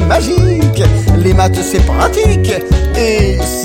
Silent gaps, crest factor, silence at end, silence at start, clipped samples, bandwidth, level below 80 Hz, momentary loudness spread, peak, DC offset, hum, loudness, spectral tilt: none; 10 dB; 0 s; 0 s; under 0.1%; 16.5 kHz; -16 dBFS; 3 LU; 0 dBFS; under 0.1%; none; -11 LUFS; -6 dB/octave